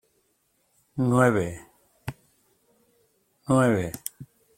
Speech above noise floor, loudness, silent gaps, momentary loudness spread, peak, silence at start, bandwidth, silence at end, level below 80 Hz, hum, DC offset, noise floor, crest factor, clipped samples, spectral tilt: 48 dB; -24 LUFS; none; 19 LU; -6 dBFS; 0.95 s; 16.5 kHz; 0.35 s; -58 dBFS; none; under 0.1%; -70 dBFS; 22 dB; under 0.1%; -6.5 dB/octave